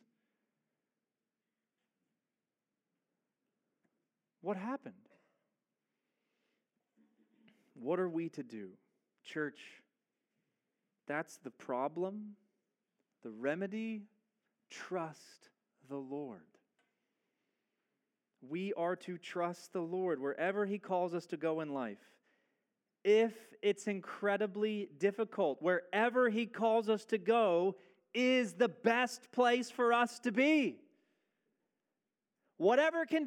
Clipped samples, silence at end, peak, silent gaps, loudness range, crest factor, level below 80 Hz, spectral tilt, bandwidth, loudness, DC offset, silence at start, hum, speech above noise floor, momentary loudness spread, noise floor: under 0.1%; 0 s; -16 dBFS; none; 16 LU; 22 dB; under -90 dBFS; -5 dB/octave; 14 kHz; -35 LUFS; under 0.1%; 4.45 s; none; over 55 dB; 16 LU; under -90 dBFS